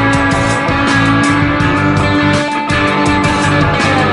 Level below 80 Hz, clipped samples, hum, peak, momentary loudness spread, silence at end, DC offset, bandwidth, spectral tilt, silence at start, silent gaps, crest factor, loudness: -28 dBFS; under 0.1%; none; 0 dBFS; 2 LU; 0 s; 0.2%; 11 kHz; -5.5 dB/octave; 0 s; none; 12 dB; -11 LUFS